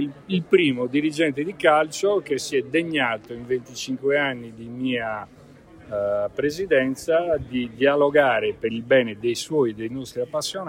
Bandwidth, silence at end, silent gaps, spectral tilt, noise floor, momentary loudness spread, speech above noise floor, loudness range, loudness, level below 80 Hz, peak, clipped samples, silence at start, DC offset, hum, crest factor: 16 kHz; 0 s; none; -4.5 dB/octave; -47 dBFS; 11 LU; 24 dB; 5 LU; -23 LUFS; -56 dBFS; -4 dBFS; under 0.1%; 0 s; under 0.1%; none; 18 dB